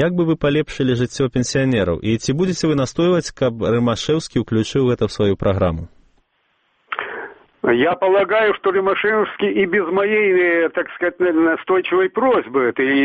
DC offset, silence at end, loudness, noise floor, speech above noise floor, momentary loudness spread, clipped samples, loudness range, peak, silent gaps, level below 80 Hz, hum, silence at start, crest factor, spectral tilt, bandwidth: under 0.1%; 0 s; -18 LUFS; -65 dBFS; 47 dB; 6 LU; under 0.1%; 4 LU; -2 dBFS; none; -44 dBFS; none; 0 s; 16 dB; -6 dB/octave; 8.8 kHz